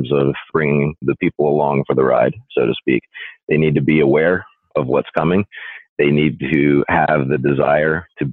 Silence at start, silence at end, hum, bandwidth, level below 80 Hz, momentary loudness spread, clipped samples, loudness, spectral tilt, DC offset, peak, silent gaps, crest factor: 0 s; 0 s; none; 4.2 kHz; -46 dBFS; 7 LU; under 0.1%; -17 LUFS; -10.5 dB/octave; under 0.1%; -4 dBFS; 3.43-3.47 s, 5.89-5.96 s; 12 dB